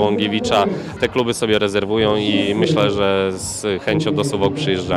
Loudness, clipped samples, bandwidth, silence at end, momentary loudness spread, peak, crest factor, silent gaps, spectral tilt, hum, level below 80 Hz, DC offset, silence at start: -18 LUFS; under 0.1%; 14.5 kHz; 0 s; 5 LU; -4 dBFS; 14 dB; none; -5 dB/octave; none; -46 dBFS; under 0.1%; 0 s